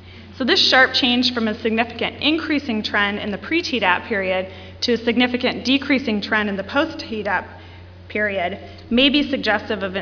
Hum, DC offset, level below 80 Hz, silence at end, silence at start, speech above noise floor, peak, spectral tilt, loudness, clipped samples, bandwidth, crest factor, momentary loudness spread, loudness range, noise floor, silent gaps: none; under 0.1%; -50 dBFS; 0 s; 0 s; 20 dB; -2 dBFS; -4 dB/octave; -19 LUFS; under 0.1%; 5.4 kHz; 20 dB; 10 LU; 4 LU; -40 dBFS; none